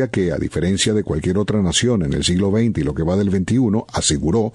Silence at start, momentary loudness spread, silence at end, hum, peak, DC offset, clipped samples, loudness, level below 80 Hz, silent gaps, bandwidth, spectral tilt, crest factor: 0 s; 3 LU; 0.05 s; none; -2 dBFS; under 0.1%; under 0.1%; -18 LUFS; -36 dBFS; none; 11 kHz; -5 dB/octave; 16 dB